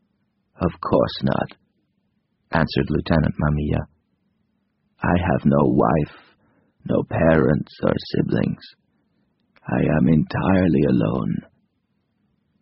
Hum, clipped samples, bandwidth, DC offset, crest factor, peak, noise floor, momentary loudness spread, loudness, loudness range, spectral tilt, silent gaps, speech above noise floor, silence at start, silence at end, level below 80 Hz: none; under 0.1%; 5.8 kHz; under 0.1%; 20 dB; -2 dBFS; -70 dBFS; 10 LU; -21 LUFS; 4 LU; -7 dB/octave; none; 51 dB; 0.6 s; 1.2 s; -40 dBFS